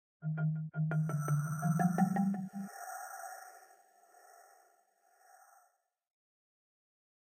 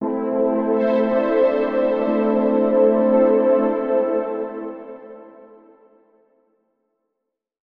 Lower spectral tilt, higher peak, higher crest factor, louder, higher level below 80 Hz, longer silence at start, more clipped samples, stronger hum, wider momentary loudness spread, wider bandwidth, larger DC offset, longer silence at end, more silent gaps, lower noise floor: second, -7.5 dB/octave vs -9.5 dB/octave; second, -18 dBFS vs -6 dBFS; first, 20 dB vs 14 dB; second, -35 LUFS vs -19 LUFS; second, -80 dBFS vs -60 dBFS; first, 0.2 s vs 0 s; neither; neither; about the same, 15 LU vs 14 LU; first, 16 kHz vs 4.9 kHz; neither; first, 2.85 s vs 2.4 s; neither; second, -75 dBFS vs -80 dBFS